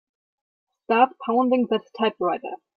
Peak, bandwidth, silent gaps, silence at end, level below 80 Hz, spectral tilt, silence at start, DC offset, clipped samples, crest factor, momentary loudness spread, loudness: -6 dBFS; 5.8 kHz; none; 0.2 s; -74 dBFS; -7.5 dB/octave; 0.9 s; under 0.1%; under 0.1%; 18 dB; 6 LU; -23 LUFS